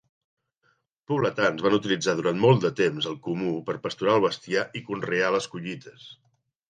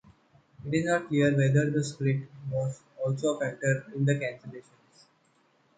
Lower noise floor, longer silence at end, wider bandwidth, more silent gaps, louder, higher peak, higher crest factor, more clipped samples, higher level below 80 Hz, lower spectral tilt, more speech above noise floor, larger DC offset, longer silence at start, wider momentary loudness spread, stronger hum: about the same, -70 dBFS vs -67 dBFS; second, 0.55 s vs 1.2 s; about the same, 9.6 kHz vs 9.4 kHz; neither; first, -25 LUFS vs -28 LUFS; first, -6 dBFS vs -12 dBFS; about the same, 20 dB vs 18 dB; neither; about the same, -66 dBFS vs -66 dBFS; about the same, -5.5 dB/octave vs -6.5 dB/octave; first, 45 dB vs 39 dB; neither; first, 1.1 s vs 0.6 s; about the same, 11 LU vs 12 LU; neither